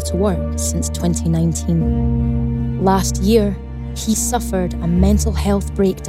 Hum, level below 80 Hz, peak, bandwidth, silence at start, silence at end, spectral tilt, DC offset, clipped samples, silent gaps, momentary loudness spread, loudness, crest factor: none; -24 dBFS; -2 dBFS; 16 kHz; 0 s; 0 s; -6 dB/octave; under 0.1%; under 0.1%; none; 5 LU; -18 LUFS; 16 dB